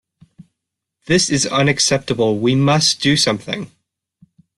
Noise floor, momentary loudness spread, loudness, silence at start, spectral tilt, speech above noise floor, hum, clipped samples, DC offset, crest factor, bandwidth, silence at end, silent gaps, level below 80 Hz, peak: -80 dBFS; 10 LU; -16 LUFS; 0.4 s; -4 dB/octave; 64 dB; none; under 0.1%; under 0.1%; 16 dB; 12 kHz; 0.9 s; none; -52 dBFS; -2 dBFS